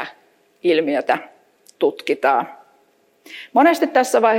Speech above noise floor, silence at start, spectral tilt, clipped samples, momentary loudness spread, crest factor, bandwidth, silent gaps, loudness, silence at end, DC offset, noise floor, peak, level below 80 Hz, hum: 42 dB; 0 s; -3.5 dB/octave; under 0.1%; 18 LU; 16 dB; 16.5 kHz; none; -18 LUFS; 0 s; under 0.1%; -59 dBFS; -2 dBFS; -78 dBFS; none